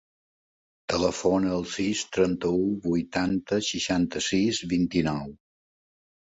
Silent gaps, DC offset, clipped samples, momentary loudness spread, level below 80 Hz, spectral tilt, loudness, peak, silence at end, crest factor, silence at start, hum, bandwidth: none; under 0.1%; under 0.1%; 4 LU; -52 dBFS; -4.5 dB/octave; -26 LUFS; -10 dBFS; 1.05 s; 18 dB; 0.9 s; none; 8 kHz